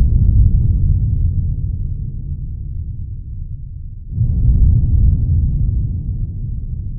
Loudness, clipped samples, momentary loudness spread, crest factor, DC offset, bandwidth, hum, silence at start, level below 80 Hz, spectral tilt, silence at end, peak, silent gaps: -18 LUFS; under 0.1%; 15 LU; 14 dB; under 0.1%; 0.8 kHz; none; 0 s; -18 dBFS; -20 dB/octave; 0 s; 0 dBFS; none